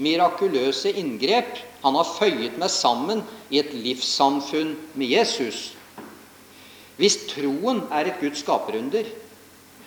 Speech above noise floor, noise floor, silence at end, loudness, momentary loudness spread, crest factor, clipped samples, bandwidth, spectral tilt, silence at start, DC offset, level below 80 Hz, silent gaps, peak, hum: 26 dB; -49 dBFS; 0 s; -23 LUFS; 13 LU; 20 dB; under 0.1%; over 20 kHz; -3 dB/octave; 0 s; under 0.1%; -72 dBFS; none; -4 dBFS; none